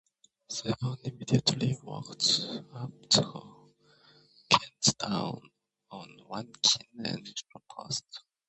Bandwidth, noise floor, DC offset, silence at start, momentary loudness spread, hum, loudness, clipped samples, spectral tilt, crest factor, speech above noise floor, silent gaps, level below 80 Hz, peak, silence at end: 8.4 kHz; -62 dBFS; under 0.1%; 0.5 s; 22 LU; none; -29 LUFS; under 0.1%; -3 dB/octave; 30 dB; 30 dB; none; -66 dBFS; -4 dBFS; 0.3 s